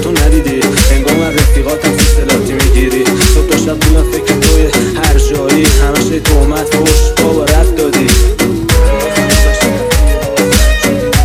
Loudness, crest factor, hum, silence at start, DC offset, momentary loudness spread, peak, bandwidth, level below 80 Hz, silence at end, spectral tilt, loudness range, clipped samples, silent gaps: -10 LUFS; 8 dB; none; 0 s; under 0.1%; 3 LU; 0 dBFS; 16.5 kHz; -12 dBFS; 0 s; -4.5 dB/octave; 0 LU; under 0.1%; none